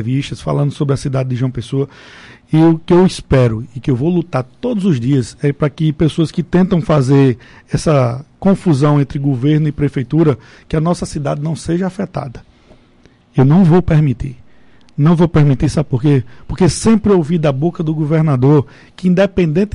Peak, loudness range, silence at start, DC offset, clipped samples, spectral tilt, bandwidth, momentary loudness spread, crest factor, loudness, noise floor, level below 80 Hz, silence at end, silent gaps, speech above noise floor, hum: -4 dBFS; 3 LU; 0 s; under 0.1%; under 0.1%; -7.5 dB/octave; 11 kHz; 9 LU; 10 dB; -14 LUFS; -48 dBFS; -36 dBFS; 0.05 s; none; 35 dB; none